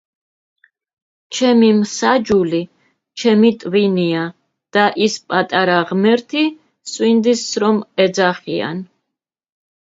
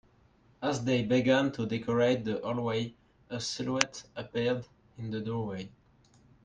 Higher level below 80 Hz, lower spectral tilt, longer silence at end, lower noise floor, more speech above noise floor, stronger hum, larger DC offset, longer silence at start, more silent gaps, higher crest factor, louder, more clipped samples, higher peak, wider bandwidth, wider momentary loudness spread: about the same, -60 dBFS vs -64 dBFS; about the same, -5 dB/octave vs -5 dB/octave; first, 1.1 s vs 0.75 s; first, -81 dBFS vs -64 dBFS; first, 66 dB vs 33 dB; neither; neither; first, 1.3 s vs 0.6 s; neither; second, 16 dB vs 30 dB; first, -16 LUFS vs -31 LUFS; neither; about the same, 0 dBFS vs -2 dBFS; second, 7.8 kHz vs 10 kHz; second, 11 LU vs 15 LU